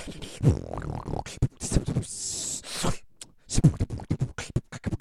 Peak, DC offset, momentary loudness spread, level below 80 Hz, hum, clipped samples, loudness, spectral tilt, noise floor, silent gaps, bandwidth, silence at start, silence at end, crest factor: -6 dBFS; under 0.1%; 11 LU; -36 dBFS; none; under 0.1%; -29 LUFS; -5 dB/octave; -49 dBFS; none; 13.5 kHz; 0 s; 0.05 s; 22 dB